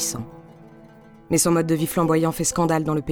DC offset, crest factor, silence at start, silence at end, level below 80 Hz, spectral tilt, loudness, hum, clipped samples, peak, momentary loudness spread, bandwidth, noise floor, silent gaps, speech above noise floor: under 0.1%; 14 dB; 0 s; 0 s; -50 dBFS; -5 dB/octave; -21 LUFS; none; under 0.1%; -8 dBFS; 7 LU; 18.5 kHz; -47 dBFS; none; 27 dB